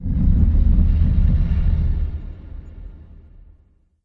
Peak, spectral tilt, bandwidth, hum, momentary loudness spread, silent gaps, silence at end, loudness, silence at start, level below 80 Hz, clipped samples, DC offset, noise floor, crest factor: -4 dBFS; -11.5 dB/octave; 3.9 kHz; none; 21 LU; none; 1 s; -19 LUFS; 0 s; -20 dBFS; under 0.1%; under 0.1%; -56 dBFS; 14 dB